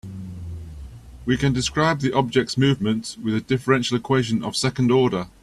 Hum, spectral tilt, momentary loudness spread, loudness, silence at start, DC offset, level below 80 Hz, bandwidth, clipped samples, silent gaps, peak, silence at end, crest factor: none; -5.5 dB/octave; 16 LU; -21 LUFS; 0.05 s; under 0.1%; -44 dBFS; 12.5 kHz; under 0.1%; none; -4 dBFS; 0.15 s; 18 dB